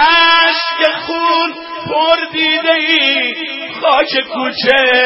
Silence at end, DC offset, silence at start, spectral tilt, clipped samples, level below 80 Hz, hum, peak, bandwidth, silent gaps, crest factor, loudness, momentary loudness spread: 0 s; under 0.1%; 0 s; -4.5 dB/octave; under 0.1%; -52 dBFS; none; 0 dBFS; 6.8 kHz; none; 12 dB; -12 LUFS; 10 LU